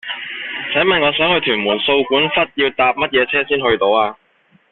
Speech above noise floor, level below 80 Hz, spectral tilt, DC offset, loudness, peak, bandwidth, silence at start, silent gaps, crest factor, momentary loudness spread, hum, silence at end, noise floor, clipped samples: 40 dB; -50 dBFS; -7.5 dB/octave; under 0.1%; -15 LUFS; -2 dBFS; 4.3 kHz; 0.05 s; none; 14 dB; 9 LU; none; 0.6 s; -56 dBFS; under 0.1%